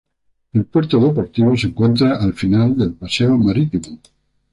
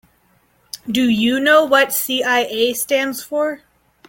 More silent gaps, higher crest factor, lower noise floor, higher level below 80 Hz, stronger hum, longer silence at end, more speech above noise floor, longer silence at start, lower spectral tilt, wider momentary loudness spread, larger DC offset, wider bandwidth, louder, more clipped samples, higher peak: neither; about the same, 12 dB vs 16 dB; about the same, -61 dBFS vs -58 dBFS; first, -42 dBFS vs -58 dBFS; neither; about the same, 0.55 s vs 0.5 s; first, 46 dB vs 42 dB; second, 0.55 s vs 0.75 s; first, -7.5 dB/octave vs -2.5 dB/octave; second, 7 LU vs 11 LU; neither; second, 11.5 kHz vs 17 kHz; about the same, -16 LUFS vs -16 LUFS; neither; about the same, -4 dBFS vs -2 dBFS